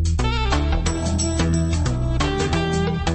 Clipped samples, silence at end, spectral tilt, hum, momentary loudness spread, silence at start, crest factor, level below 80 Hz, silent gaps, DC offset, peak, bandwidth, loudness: under 0.1%; 0 s; -5 dB/octave; none; 2 LU; 0 s; 14 dB; -24 dBFS; none; under 0.1%; -6 dBFS; 8.8 kHz; -21 LUFS